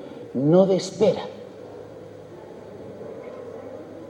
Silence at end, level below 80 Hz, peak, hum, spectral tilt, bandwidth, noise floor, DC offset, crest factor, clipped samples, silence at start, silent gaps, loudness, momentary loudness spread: 0 s; -68 dBFS; -4 dBFS; none; -7 dB/octave; 10.5 kHz; -41 dBFS; under 0.1%; 20 dB; under 0.1%; 0 s; none; -21 LUFS; 23 LU